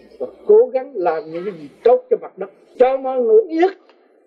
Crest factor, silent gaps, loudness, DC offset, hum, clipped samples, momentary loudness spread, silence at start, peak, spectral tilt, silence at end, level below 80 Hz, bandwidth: 16 dB; none; -17 LUFS; under 0.1%; none; under 0.1%; 17 LU; 0.2 s; -2 dBFS; -7.5 dB/octave; 0.5 s; -64 dBFS; 5.2 kHz